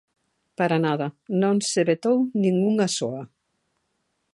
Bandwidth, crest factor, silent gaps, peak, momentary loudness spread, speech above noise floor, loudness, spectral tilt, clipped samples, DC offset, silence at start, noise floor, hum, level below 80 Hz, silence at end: 11.5 kHz; 16 dB; none; -8 dBFS; 7 LU; 52 dB; -23 LUFS; -5.5 dB/octave; under 0.1%; under 0.1%; 0.6 s; -74 dBFS; none; -72 dBFS; 1.1 s